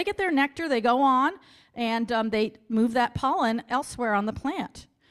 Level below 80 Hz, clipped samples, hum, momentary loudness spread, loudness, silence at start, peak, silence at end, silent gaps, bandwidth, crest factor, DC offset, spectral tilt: -56 dBFS; under 0.1%; none; 10 LU; -25 LUFS; 0 s; -10 dBFS; 0.25 s; none; 13 kHz; 16 dB; under 0.1%; -5 dB/octave